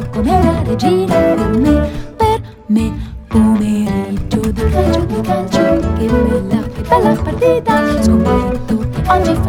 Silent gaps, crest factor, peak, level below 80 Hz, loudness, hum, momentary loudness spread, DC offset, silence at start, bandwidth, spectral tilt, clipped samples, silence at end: none; 14 dB; 0 dBFS; -24 dBFS; -14 LUFS; none; 6 LU; under 0.1%; 0 s; 16.5 kHz; -7 dB/octave; under 0.1%; 0 s